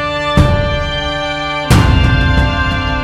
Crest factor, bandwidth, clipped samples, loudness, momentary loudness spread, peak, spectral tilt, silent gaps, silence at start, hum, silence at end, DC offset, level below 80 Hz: 12 dB; 15.5 kHz; under 0.1%; -13 LUFS; 6 LU; 0 dBFS; -6 dB/octave; none; 0 s; none; 0 s; under 0.1%; -18 dBFS